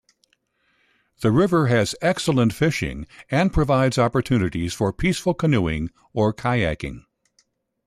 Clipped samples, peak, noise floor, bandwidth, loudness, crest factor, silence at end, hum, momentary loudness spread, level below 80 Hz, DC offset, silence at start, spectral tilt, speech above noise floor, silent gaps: under 0.1%; -6 dBFS; -67 dBFS; 14 kHz; -21 LUFS; 16 dB; 0.85 s; none; 9 LU; -40 dBFS; under 0.1%; 1.2 s; -6 dB/octave; 46 dB; none